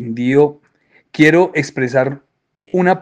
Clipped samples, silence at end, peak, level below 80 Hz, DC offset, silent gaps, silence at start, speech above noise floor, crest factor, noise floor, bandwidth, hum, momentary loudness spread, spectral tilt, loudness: under 0.1%; 0 s; 0 dBFS; -60 dBFS; under 0.1%; none; 0 s; 42 dB; 16 dB; -56 dBFS; 9.8 kHz; none; 11 LU; -6.5 dB/octave; -15 LUFS